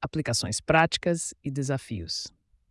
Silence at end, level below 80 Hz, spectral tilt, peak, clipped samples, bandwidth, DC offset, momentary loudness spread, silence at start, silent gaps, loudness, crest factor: 0.45 s; -54 dBFS; -4 dB/octave; -8 dBFS; under 0.1%; 12 kHz; under 0.1%; 11 LU; 0 s; none; -27 LUFS; 20 dB